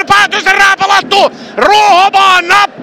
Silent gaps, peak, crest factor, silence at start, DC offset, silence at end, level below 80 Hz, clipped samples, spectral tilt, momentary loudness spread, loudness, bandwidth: none; 0 dBFS; 8 dB; 0 s; 0.6%; 0 s; -44 dBFS; 0.5%; -1.5 dB/octave; 4 LU; -7 LUFS; 16.5 kHz